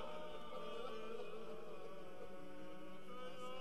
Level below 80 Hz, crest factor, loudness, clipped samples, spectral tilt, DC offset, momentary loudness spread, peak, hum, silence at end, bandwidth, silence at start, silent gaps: -72 dBFS; 14 dB; -52 LUFS; under 0.1%; -5 dB/octave; 0.5%; 6 LU; -34 dBFS; none; 0 s; 13 kHz; 0 s; none